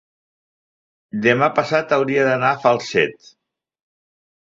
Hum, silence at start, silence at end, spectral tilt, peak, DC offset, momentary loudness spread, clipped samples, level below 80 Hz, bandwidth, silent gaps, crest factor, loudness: none; 1.15 s; 1.3 s; -5.5 dB/octave; -2 dBFS; under 0.1%; 4 LU; under 0.1%; -62 dBFS; 7.8 kHz; none; 18 dB; -18 LUFS